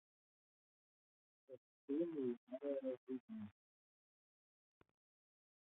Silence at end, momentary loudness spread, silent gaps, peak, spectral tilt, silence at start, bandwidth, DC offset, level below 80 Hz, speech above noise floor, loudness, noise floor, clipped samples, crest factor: 2.15 s; 20 LU; 1.58-1.88 s, 2.37-2.47 s, 2.97-3.07 s, 3.20-3.28 s; -32 dBFS; -7 dB/octave; 1.5 s; 3.9 kHz; under 0.1%; under -90 dBFS; over 45 dB; -46 LUFS; under -90 dBFS; under 0.1%; 20 dB